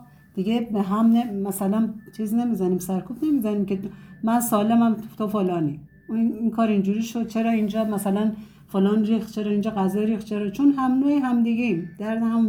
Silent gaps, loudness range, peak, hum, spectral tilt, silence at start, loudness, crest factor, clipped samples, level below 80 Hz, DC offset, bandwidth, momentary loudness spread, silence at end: none; 2 LU; -8 dBFS; none; -6.5 dB/octave; 0 s; -23 LUFS; 14 dB; under 0.1%; -58 dBFS; under 0.1%; 17.5 kHz; 9 LU; 0 s